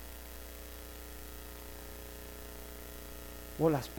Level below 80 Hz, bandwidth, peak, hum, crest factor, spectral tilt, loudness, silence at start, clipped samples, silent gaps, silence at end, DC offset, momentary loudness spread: -50 dBFS; 19 kHz; -16 dBFS; 60 Hz at -50 dBFS; 24 dB; -5.5 dB/octave; -42 LUFS; 0 s; under 0.1%; none; 0 s; under 0.1%; 15 LU